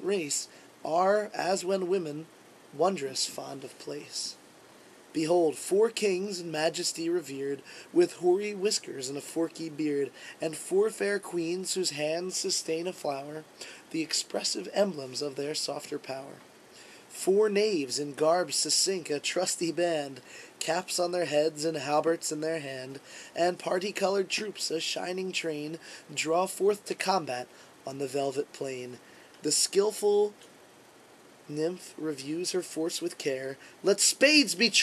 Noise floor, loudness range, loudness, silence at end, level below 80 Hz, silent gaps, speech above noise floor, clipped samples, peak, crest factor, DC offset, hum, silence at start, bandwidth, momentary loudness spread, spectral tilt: -55 dBFS; 4 LU; -29 LUFS; 0 s; -84 dBFS; none; 26 dB; under 0.1%; -8 dBFS; 22 dB; under 0.1%; none; 0 s; 13.5 kHz; 15 LU; -2.5 dB/octave